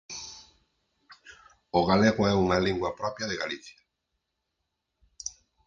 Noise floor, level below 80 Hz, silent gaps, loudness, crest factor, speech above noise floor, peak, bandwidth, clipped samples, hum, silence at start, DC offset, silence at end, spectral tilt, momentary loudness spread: -82 dBFS; -52 dBFS; none; -26 LUFS; 22 dB; 56 dB; -8 dBFS; 7.6 kHz; under 0.1%; none; 0.1 s; under 0.1%; 0.35 s; -5 dB/octave; 17 LU